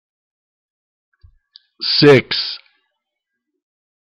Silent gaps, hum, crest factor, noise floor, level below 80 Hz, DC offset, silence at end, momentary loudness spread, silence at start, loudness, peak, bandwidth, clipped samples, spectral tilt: none; none; 18 dB; -79 dBFS; -56 dBFS; under 0.1%; 1.55 s; 15 LU; 1.8 s; -14 LUFS; -2 dBFS; 10 kHz; under 0.1%; -6 dB/octave